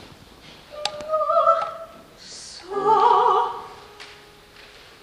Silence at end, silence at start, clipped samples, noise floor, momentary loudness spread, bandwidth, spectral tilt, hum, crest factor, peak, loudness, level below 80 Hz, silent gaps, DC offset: 0.9 s; 0 s; under 0.1%; -47 dBFS; 25 LU; 14.5 kHz; -3 dB/octave; none; 20 dB; -4 dBFS; -20 LUFS; -60 dBFS; none; under 0.1%